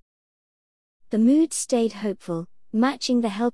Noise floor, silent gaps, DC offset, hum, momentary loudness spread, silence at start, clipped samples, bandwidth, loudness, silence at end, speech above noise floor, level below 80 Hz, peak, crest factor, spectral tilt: under -90 dBFS; none; 0.3%; none; 12 LU; 1.1 s; under 0.1%; 12 kHz; -23 LUFS; 0.05 s; over 68 dB; -68 dBFS; -10 dBFS; 14 dB; -4.5 dB/octave